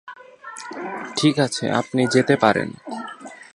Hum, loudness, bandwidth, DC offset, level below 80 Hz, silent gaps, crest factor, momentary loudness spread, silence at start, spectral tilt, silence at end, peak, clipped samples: none; -20 LUFS; 11.5 kHz; under 0.1%; -62 dBFS; none; 22 dB; 20 LU; 0.05 s; -5 dB/octave; 0.1 s; 0 dBFS; under 0.1%